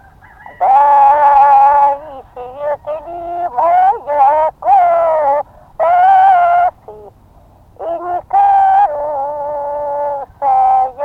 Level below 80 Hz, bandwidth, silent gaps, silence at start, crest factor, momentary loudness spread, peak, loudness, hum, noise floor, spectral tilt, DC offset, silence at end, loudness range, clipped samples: -48 dBFS; 4.5 kHz; none; 0.45 s; 10 dB; 15 LU; -2 dBFS; -12 LUFS; none; -44 dBFS; -5.5 dB/octave; under 0.1%; 0 s; 4 LU; under 0.1%